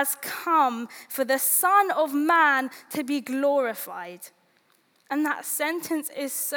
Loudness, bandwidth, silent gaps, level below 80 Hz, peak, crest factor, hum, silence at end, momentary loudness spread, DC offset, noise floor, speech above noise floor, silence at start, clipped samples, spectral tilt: -24 LUFS; over 20 kHz; none; -88 dBFS; -8 dBFS; 18 dB; none; 0 s; 15 LU; under 0.1%; -65 dBFS; 40 dB; 0 s; under 0.1%; -1.5 dB/octave